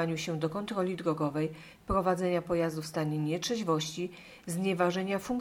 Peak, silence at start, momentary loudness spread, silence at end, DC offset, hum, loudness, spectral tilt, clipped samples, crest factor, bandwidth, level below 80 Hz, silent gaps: -14 dBFS; 0 s; 8 LU; 0 s; under 0.1%; none; -32 LUFS; -5.5 dB/octave; under 0.1%; 18 dB; 17.5 kHz; -54 dBFS; none